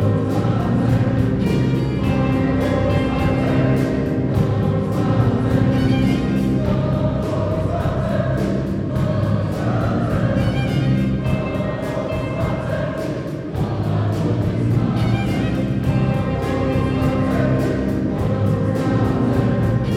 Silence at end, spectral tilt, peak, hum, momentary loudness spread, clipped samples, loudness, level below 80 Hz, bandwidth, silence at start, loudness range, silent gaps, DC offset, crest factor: 0 s; -8.5 dB/octave; -4 dBFS; none; 4 LU; under 0.1%; -19 LUFS; -32 dBFS; 13.5 kHz; 0 s; 3 LU; none; under 0.1%; 14 dB